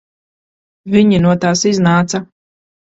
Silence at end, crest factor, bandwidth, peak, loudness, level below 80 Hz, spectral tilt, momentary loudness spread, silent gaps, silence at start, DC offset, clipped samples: 0.65 s; 14 dB; 7.8 kHz; 0 dBFS; -13 LUFS; -46 dBFS; -5.5 dB/octave; 7 LU; none; 0.85 s; under 0.1%; under 0.1%